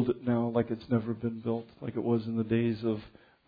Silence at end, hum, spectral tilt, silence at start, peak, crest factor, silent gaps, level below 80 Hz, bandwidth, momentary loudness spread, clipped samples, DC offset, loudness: 0.4 s; none; -11 dB/octave; 0 s; -14 dBFS; 16 dB; none; -64 dBFS; 5 kHz; 6 LU; under 0.1%; under 0.1%; -31 LUFS